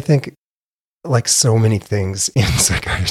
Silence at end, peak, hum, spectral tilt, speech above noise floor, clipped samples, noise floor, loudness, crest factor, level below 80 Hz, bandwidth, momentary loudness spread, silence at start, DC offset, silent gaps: 0 s; -2 dBFS; none; -4 dB/octave; over 74 dB; under 0.1%; under -90 dBFS; -16 LUFS; 16 dB; -34 dBFS; 15 kHz; 8 LU; 0 s; under 0.1%; 0.38-1.01 s